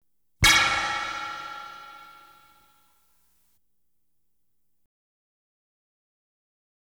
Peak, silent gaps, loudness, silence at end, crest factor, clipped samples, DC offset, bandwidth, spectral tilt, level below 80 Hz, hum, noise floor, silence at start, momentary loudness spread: -6 dBFS; none; -22 LUFS; 4.75 s; 24 dB; under 0.1%; under 0.1%; over 20 kHz; -1 dB/octave; -48 dBFS; 60 Hz at -85 dBFS; -79 dBFS; 0.4 s; 25 LU